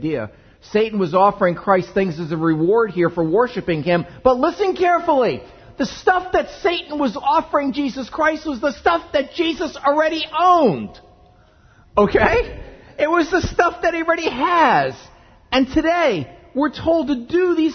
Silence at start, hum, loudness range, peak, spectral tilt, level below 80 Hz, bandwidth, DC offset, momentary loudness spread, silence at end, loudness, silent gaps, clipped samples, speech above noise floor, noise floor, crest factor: 0 s; none; 2 LU; 0 dBFS; -6 dB/octave; -42 dBFS; 6.6 kHz; under 0.1%; 8 LU; 0 s; -18 LUFS; none; under 0.1%; 33 dB; -51 dBFS; 18 dB